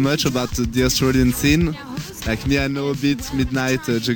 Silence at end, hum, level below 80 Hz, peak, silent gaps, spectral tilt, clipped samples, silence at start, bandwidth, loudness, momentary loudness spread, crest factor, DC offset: 0 s; none; -32 dBFS; -4 dBFS; none; -5 dB/octave; under 0.1%; 0 s; 19.5 kHz; -20 LUFS; 8 LU; 16 dB; under 0.1%